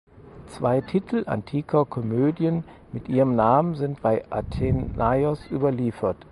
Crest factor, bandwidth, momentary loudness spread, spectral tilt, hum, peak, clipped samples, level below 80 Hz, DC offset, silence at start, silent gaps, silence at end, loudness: 18 dB; 11.5 kHz; 8 LU; -9.5 dB/octave; none; -6 dBFS; under 0.1%; -42 dBFS; under 0.1%; 0.15 s; none; 0.1 s; -24 LUFS